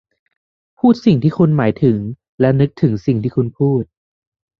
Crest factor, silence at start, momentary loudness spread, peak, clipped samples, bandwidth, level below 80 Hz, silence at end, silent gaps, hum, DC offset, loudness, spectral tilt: 14 dB; 0.85 s; 7 LU; -2 dBFS; under 0.1%; 6.6 kHz; -48 dBFS; 0.75 s; 2.29-2.38 s; none; under 0.1%; -16 LUFS; -9.5 dB/octave